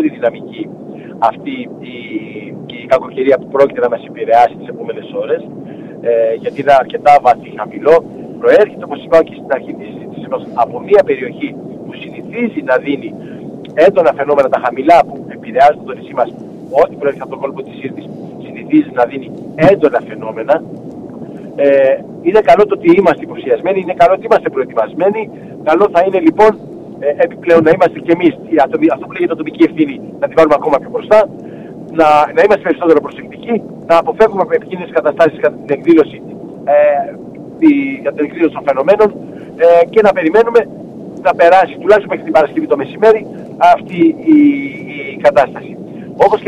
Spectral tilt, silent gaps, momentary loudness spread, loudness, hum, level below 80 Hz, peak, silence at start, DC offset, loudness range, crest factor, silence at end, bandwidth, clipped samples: -7 dB/octave; none; 18 LU; -12 LUFS; none; -50 dBFS; 0 dBFS; 0 s; under 0.1%; 5 LU; 12 dB; 0 s; 10 kHz; under 0.1%